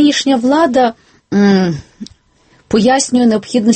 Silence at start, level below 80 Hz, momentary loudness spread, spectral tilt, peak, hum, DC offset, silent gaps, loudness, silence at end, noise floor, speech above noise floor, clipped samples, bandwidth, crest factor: 0 s; -48 dBFS; 8 LU; -5 dB/octave; 0 dBFS; none; under 0.1%; none; -12 LUFS; 0 s; -51 dBFS; 39 dB; under 0.1%; 8.8 kHz; 12 dB